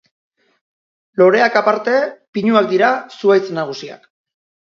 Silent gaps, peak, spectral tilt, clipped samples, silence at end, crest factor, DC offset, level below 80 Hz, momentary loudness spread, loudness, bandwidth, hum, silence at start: 2.28-2.33 s; 0 dBFS; -6 dB/octave; under 0.1%; 0.75 s; 16 dB; under 0.1%; -68 dBFS; 13 LU; -15 LUFS; 7.2 kHz; none; 1.15 s